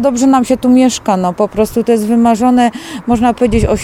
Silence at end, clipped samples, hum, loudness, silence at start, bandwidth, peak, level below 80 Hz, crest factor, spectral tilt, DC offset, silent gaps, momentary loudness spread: 0 s; under 0.1%; none; -11 LUFS; 0 s; 15 kHz; 0 dBFS; -30 dBFS; 10 dB; -5.5 dB/octave; under 0.1%; none; 5 LU